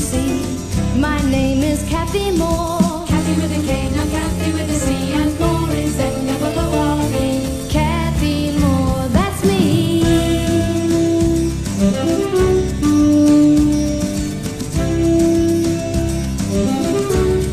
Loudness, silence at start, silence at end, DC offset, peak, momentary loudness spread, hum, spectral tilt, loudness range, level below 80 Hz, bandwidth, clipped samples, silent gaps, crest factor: -17 LUFS; 0 s; 0 s; 0.3%; -2 dBFS; 5 LU; none; -6 dB/octave; 3 LU; -26 dBFS; 13 kHz; under 0.1%; none; 14 dB